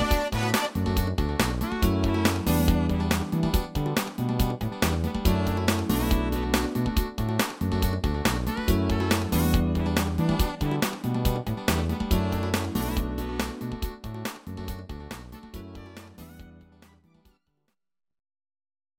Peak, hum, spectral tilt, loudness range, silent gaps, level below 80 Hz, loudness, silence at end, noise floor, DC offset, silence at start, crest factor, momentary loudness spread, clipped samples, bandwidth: -8 dBFS; none; -5.5 dB/octave; 13 LU; none; -32 dBFS; -26 LUFS; 2.45 s; -78 dBFS; under 0.1%; 0 s; 18 dB; 14 LU; under 0.1%; 17 kHz